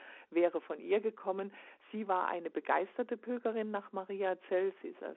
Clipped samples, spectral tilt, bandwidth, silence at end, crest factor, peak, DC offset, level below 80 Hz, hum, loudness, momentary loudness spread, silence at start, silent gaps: under 0.1%; -4 dB/octave; 4 kHz; 0 s; 20 dB; -16 dBFS; under 0.1%; under -90 dBFS; none; -36 LUFS; 9 LU; 0 s; none